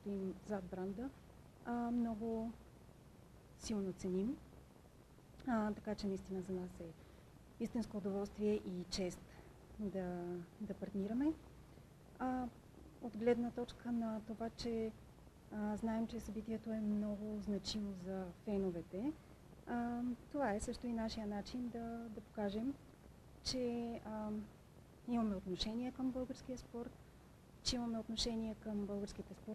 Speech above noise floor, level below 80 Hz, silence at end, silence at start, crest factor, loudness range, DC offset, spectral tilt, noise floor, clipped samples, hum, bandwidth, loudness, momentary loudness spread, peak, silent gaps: 20 dB; -62 dBFS; 0 s; 0 s; 18 dB; 2 LU; under 0.1%; -5.5 dB/octave; -63 dBFS; under 0.1%; none; 13 kHz; -43 LUFS; 22 LU; -24 dBFS; none